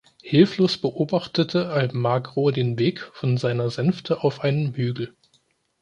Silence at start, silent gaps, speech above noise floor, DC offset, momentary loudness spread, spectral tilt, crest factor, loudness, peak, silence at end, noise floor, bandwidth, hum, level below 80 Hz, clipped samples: 0.25 s; none; 44 dB; under 0.1%; 7 LU; -7.5 dB/octave; 20 dB; -23 LUFS; -2 dBFS; 0.7 s; -65 dBFS; 9.8 kHz; none; -62 dBFS; under 0.1%